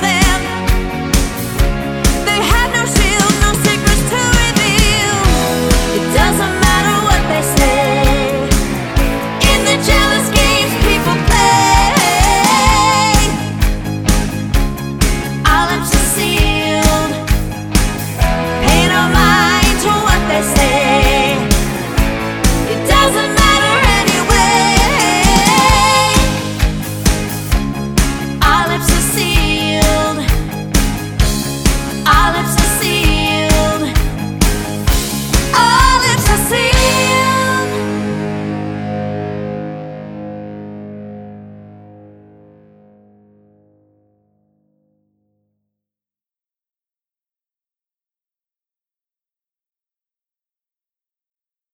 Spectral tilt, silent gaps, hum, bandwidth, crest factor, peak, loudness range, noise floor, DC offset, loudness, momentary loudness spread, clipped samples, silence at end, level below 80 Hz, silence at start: -3.5 dB/octave; none; none; 19.5 kHz; 14 dB; 0 dBFS; 4 LU; under -90 dBFS; under 0.1%; -13 LUFS; 9 LU; under 0.1%; 9.95 s; -20 dBFS; 0 s